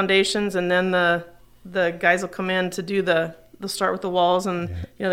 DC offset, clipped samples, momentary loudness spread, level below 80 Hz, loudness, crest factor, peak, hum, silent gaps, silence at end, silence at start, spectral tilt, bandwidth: under 0.1%; under 0.1%; 10 LU; -52 dBFS; -22 LUFS; 18 dB; -4 dBFS; none; none; 0 s; 0 s; -4.5 dB/octave; 16 kHz